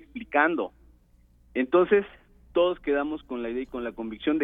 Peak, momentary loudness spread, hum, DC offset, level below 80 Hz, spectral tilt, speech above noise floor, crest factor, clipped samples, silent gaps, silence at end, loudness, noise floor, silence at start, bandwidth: -6 dBFS; 12 LU; none; under 0.1%; -56 dBFS; -8 dB/octave; 34 dB; 20 dB; under 0.1%; none; 0 s; -27 LUFS; -59 dBFS; 0.15 s; 3.9 kHz